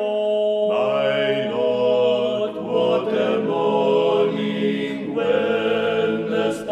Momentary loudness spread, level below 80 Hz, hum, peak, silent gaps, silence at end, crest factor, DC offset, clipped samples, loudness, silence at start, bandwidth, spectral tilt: 5 LU; -64 dBFS; none; -8 dBFS; none; 0 s; 12 dB; under 0.1%; under 0.1%; -20 LUFS; 0 s; 10.5 kHz; -6 dB/octave